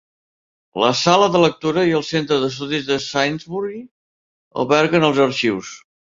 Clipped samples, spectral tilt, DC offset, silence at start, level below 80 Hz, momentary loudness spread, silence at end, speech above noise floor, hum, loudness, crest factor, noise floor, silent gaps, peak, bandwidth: under 0.1%; -4.5 dB/octave; under 0.1%; 0.75 s; -58 dBFS; 14 LU; 0.35 s; over 72 dB; none; -18 LUFS; 18 dB; under -90 dBFS; 3.91-4.51 s; -2 dBFS; 7.8 kHz